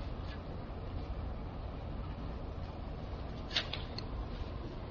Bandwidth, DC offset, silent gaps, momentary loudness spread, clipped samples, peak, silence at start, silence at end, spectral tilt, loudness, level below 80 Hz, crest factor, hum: 7 kHz; under 0.1%; none; 8 LU; under 0.1%; -20 dBFS; 0 s; 0 s; -4 dB/octave; -42 LUFS; -44 dBFS; 22 dB; none